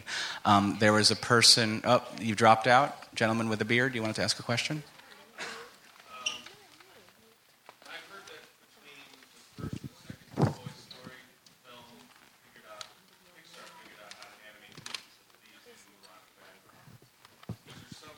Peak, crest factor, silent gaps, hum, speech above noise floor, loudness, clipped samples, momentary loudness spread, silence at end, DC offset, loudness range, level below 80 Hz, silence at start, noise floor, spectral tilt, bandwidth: -6 dBFS; 26 dB; none; none; 36 dB; -26 LUFS; under 0.1%; 27 LU; 0.05 s; under 0.1%; 26 LU; -68 dBFS; 0.05 s; -62 dBFS; -3.5 dB/octave; 17 kHz